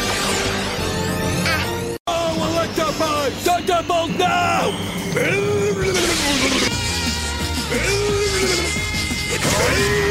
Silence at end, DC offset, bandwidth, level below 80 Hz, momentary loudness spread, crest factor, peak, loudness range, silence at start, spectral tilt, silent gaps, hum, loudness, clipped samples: 0 s; under 0.1%; 16 kHz; -34 dBFS; 5 LU; 16 dB; -4 dBFS; 2 LU; 0 s; -3.5 dB/octave; 2.00-2.05 s; none; -19 LUFS; under 0.1%